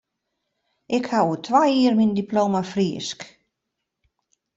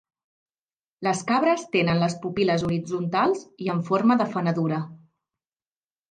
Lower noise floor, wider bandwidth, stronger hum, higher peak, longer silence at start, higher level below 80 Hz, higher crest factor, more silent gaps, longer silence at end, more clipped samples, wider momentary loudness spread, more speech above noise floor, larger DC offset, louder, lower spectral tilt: second, -81 dBFS vs under -90 dBFS; second, 8 kHz vs 9.6 kHz; neither; about the same, -6 dBFS vs -8 dBFS; about the same, 0.9 s vs 1 s; about the same, -64 dBFS vs -60 dBFS; about the same, 18 dB vs 16 dB; neither; first, 1.3 s vs 1.15 s; neither; first, 13 LU vs 7 LU; second, 60 dB vs over 67 dB; neither; first, -21 LUFS vs -24 LUFS; about the same, -6 dB/octave vs -6 dB/octave